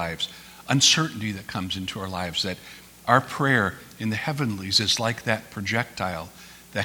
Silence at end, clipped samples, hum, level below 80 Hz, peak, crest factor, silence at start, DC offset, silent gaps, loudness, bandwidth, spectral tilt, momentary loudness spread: 0 s; under 0.1%; none; -56 dBFS; -2 dBFS; 24 dB; 0 s; under 0.1%; none; -24 LUFS; over 20 kHz; -3 dB/octave; 14 LU